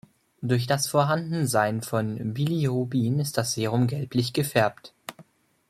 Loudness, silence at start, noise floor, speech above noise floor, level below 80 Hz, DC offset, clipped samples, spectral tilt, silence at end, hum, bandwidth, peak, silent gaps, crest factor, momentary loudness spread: -25 LUFS; 0.4 s; -55 dBFS; 30 dB; -62 dBFS; under 0.1%; under 0.1%; -5.5 dB/octave; 0.45 s; none; 15.5 kHz; -6 dBFS; none; 18 dB; 7 LU